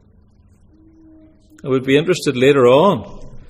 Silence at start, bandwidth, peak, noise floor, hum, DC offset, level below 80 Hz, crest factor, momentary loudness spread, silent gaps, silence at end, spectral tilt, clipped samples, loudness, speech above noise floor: 1.65 s; 14.5 kHz; 0 dBFS; -50 dBFS; none; under 0.1%; -44 dBFS; 16 dB; 16 LU; none; 0.1 s; -6 dB/octave; under 0.1%; -14 LUFS; 36 dB